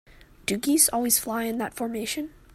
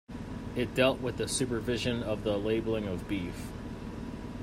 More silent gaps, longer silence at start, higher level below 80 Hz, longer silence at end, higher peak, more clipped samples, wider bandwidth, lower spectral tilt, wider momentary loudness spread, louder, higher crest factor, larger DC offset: neither; first, 0.45 s vs 0.1 s; second, -56 dBFS vs -48 dBFS; first, 0.25 s vs 0 s; first, -6 dBFS vs -12 dBFS; neither; about the same, 16 kHz vs 16 kHz; second, -2 dB/octave vs -5 dB/octave; about the same, 11 LU vs 13 LU; first, -24 LUFS vs -32 LUFS; about the same, 22 dB vs 20 dB; neither